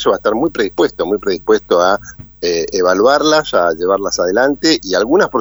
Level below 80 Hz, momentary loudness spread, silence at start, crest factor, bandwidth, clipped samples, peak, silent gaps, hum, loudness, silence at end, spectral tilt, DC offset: -44 dBFS; 6 LU; 0 s; 14 dB; over 20 kHz; under 0.1%; 0 dBFS; none; none; -14 LUFS; 0 s; -3.5 dB/octave; under 0.1%